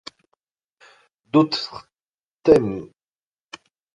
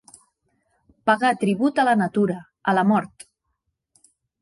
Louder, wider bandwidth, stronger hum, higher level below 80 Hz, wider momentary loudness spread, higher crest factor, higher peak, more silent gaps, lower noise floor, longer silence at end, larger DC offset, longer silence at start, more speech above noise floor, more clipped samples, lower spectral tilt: about the same, -20 LUFS vs -21 LUFS; about the same, 11 kHz vs 11.5 kHz; neither; first, -54 dBFS vs -66 dBFS; first, 26 LU vs 7 LU; about the same, 22 dB vs 18 dB; first, -2 dBFS vs -6 dBFS; first, 2.09-2.18 s, 2.27-2.37 s vs none; first, under -90 dBFS vs -76 dBFS; second, 1.1 s vs 1.35 s; neither; first, 1.35 s vs 1.05 s; first, over 72 dB vs 56 dB; neither; about the same, -6.5 dB/octave vs -6.5 dB/octave